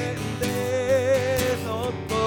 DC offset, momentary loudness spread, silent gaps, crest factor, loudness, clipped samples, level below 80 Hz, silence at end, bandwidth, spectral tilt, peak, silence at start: under 0.1%; 7 LU; none; 14 dB; -24 LUFS; under 0.1%; -46 dBFS; 0 s; over 20 kHz; -5 dB/octave; -10 dBFS; 0 s